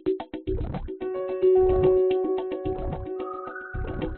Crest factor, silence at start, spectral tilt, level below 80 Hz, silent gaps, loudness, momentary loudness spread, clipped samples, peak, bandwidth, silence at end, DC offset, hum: 16 dB; 0.05 s; -7.5 dB/octave; -38 dBFS; none; -26 LUFS; 14 LU; under 0.1%; -10 dBFS; 4.2 kHz; 0 s; under 0.1%; none